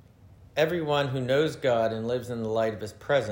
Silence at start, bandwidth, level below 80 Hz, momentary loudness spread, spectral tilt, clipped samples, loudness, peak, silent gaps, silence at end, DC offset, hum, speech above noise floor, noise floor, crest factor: 0.25 s; 16.5 kHz; -60 dBFS; 6 LU; -6 dB/octave; under 0.1%; -27 LUFS; -10 dBFS; none; 0 s; under 0.1%; none; 26 dB; -53 dBFS; 16 dB